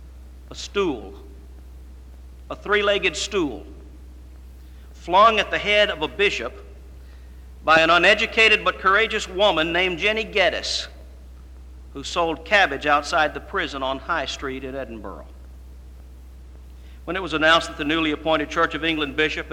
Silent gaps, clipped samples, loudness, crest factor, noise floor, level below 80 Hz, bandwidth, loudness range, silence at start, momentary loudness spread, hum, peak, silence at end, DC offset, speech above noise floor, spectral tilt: none; under 0.1%; -20 LUFS; 20 dB; -41 dBFS; -42 dBFS; 16 kHz; 9 LU; 0 s; 19 LU; none; -4 dBFS; 0 s; under 0.1%; 20 dB; -3.5 dB/octave